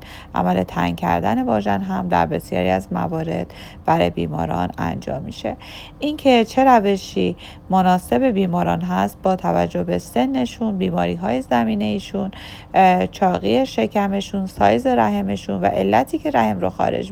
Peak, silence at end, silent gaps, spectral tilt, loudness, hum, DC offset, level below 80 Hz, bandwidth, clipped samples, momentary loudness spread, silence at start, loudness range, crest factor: 0 dBFS; 0 s; none; -6.5 dB/octave; -19 LUFS; none; under 0.1%; -44 dBFS; 16.5 kHz; under 0.1%; 11 LU; 0 s; 3 LU; 18 dB